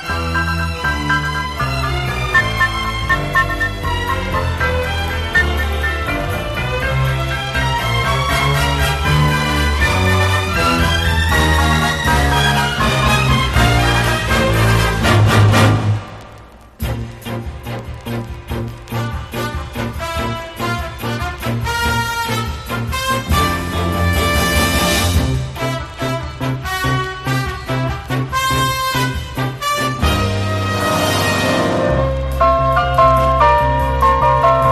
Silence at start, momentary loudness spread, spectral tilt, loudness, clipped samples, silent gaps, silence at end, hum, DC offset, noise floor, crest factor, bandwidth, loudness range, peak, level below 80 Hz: 0 s; 11 LU; -5 dB/octave; -16 LUFS; under 0.1%; none; 0 s; none; under 0.1%; -39 dBFS; 16 dB; 15.5 kHz; 8 LU; 0 dBFS; -24 dBFS